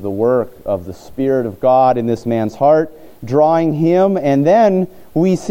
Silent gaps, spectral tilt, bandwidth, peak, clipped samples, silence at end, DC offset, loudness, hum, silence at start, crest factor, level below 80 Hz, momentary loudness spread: none; -8 dB/octave; 16.5 kHz; -2 dBFS; under 0.1%; 0 s; under 0.1%; -15 LUFS; none; 0 s; 14 dB; -50 dBFS; 10 LU